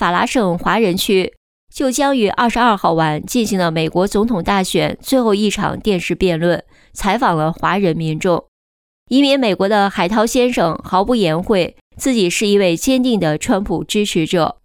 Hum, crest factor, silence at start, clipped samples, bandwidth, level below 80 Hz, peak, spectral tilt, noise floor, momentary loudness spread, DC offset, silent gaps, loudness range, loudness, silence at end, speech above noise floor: none; 12 dB; 0 s; under 0.1%; 19.5 kHz; -40 dBFS; -2 dBFS; -5 dB/octave; under -90 dBFS; 5 LU; under 0.1%; 1.37-1.67 s, 8.48-9.06 s, 11.81-11.91 s; 2 LU; -16 LUFS; 0.1 s; over 75 dB